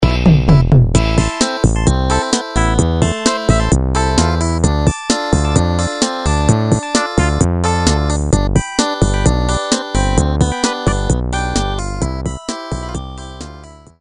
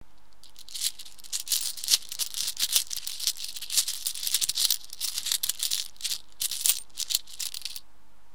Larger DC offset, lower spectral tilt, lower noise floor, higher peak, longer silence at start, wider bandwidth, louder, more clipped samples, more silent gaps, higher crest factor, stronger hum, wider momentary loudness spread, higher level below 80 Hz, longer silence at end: second, under 0.1% vs 1%; first, -5 dB/octave vs 3.5 dB/octave; second, -36 dBFS vs -62 dBFS; about the same, 0 dBFS vs 0 dBFS; second, 0 s vs 0.45 s; second, 11.5 kHz vs 19 kHz; first, -15 LUFS vs -27 LUFS; neither; neither; second, 14 dB vs 30 dB; neither; about the same, 10 LU vs 10 LU; first, -20 dBFS vs -64 dBFS; second, 0.25 s vs 0.55 s